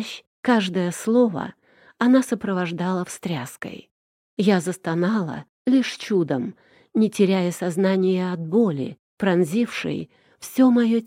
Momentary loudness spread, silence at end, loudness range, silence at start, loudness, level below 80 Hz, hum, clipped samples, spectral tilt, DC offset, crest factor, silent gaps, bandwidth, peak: 14 LU; 0 s; 3 LU; 0 s; -22 LUFS; -68 dBFS; none; under 0.1%; -6 dB/octave; under 0.1%; 16 dB; 0.27-0.43 s, 3.91-4.37 s, 5.49-5.65 s, 8.99-9.17 s; 16 kHz; -6 dBFS